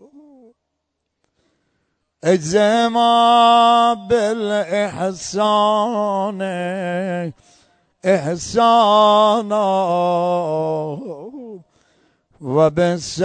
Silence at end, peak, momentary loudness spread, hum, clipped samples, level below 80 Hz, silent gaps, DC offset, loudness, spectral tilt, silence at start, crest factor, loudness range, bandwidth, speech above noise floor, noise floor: 0 s; -2 dBFS; 13 LU; none; under 0.1%; -56 dBFS; none; under 0.1%; -16 LUFS; -5 dB/octave; 2.2 s; 16 dB; 6 LU; 9.4 kHz; 59 dB; -75 dBFS